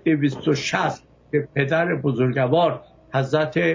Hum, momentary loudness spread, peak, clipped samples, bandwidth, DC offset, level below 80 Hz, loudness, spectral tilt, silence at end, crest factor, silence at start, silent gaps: none; 7 LU; -6 dBFS; under 0.1%; 7.6 kHz; under 0.1%; -58 dBFS; -22 LUFS; -6.5 dB/octave; 0 s; 16 dB; 0.05 s; none